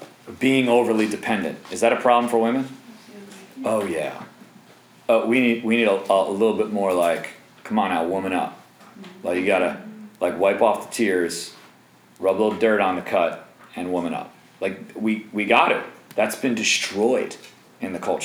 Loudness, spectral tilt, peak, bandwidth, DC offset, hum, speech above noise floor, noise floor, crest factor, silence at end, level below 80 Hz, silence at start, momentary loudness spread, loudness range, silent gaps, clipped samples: -22 LUFS; -4 dB/octave; -2 dBFS; over 20 kHz; under 0.1%; none; 31 dB; -52 dBFS; 20 dB; 0 s; -70 dBFS; 0 s; 16 LU; 3 LU; none; under 0.1%